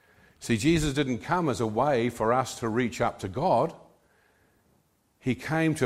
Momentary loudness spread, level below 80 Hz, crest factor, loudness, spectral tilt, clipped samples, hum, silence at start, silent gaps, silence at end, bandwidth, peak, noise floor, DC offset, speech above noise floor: 7 LU; -50 dBFS; 18 dB; -27 LUFS; -5.5 dB/octave; under 0.1%; none; 0.4 s; none; 0 s; 15.5 kHz; -10 dBFS; -68 dBFS; under 0.1%; 42 dB